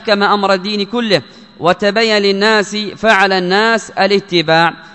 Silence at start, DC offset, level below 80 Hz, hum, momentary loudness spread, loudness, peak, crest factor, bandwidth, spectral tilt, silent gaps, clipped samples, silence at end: 0 s; 0.2%; -54 dBFS; none; 5 LU; -13 LUFS; 0 dBFS; 14 dB; 11 kHz; -4.5 dB/octave; none; 0.2%; 0.05 s